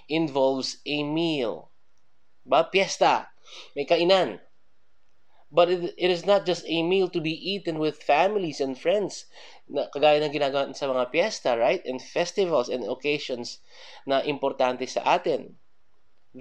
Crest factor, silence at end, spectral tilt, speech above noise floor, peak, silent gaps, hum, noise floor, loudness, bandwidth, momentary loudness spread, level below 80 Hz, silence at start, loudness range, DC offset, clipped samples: 20 dB; 0 s; -4.5 dB/octave; 47 dB; -6 dBFS; none; none; -72 dBFS; -25 LUFS; 9.6 kHz; 11 LU; -76 dBFS; 0.1 s; 2 LU; 0.3%; under 0.1%